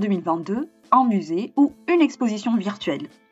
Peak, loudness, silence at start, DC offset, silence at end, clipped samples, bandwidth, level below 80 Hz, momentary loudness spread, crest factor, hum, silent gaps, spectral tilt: -4 dBFS; -22 LUFS; 0 s; under 0.1%; 0.25 s; under 0.1%; 8 kHz; -68 dBFS; 10 LU; 18 dB; none; none; -6.5 dB/octave